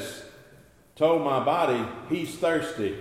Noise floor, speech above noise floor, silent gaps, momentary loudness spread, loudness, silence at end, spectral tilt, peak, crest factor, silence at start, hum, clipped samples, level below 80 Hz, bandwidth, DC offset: -55 dBFS; 29 dB; none; 8 LU; -26 LUFS; 0 s; -5.5 dB/octave; -10 dBFS; 16 dB; 0 s; none; under 0.1%; -64 dBFS; 15.5 kHz; under 0.1%